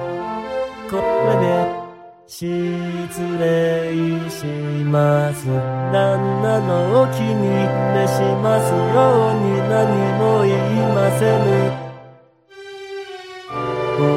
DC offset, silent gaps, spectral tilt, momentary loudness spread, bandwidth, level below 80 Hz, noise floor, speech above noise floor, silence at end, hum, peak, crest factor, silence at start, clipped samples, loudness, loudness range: under 0.1%; none; -7 dB/octave; 14 LU; 15.5 kHz; -54 dBFS; -46 dBFS; 30 dB; 0 s; none; -4 dBFS; 14 dB; 0 s; under 0.1%; -18 LUFS; 5 LU